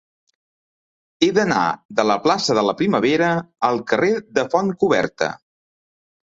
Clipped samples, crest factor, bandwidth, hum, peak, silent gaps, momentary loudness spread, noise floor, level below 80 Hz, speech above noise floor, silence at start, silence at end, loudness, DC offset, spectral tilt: under 0.1%; 18 dB; 8 kHz; none; -2 dBFS; 1.85-1.89 s; 4 LU; under -90 dBFS; -60 dBFS; over 71 dB; 1.2 s; 0.95 s; -19 LUFS; under 0.1%; -5 dB/octave